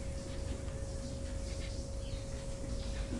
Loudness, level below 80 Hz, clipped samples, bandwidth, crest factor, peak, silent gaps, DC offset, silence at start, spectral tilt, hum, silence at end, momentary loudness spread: -42 LUFS; -42 dBFS; under 0.1%; 11.5 kHz; 14 dB; -26 dBFS; none; under 0.1%; 0 s; -5.5 dB/octave; none; 0 s; 1 LU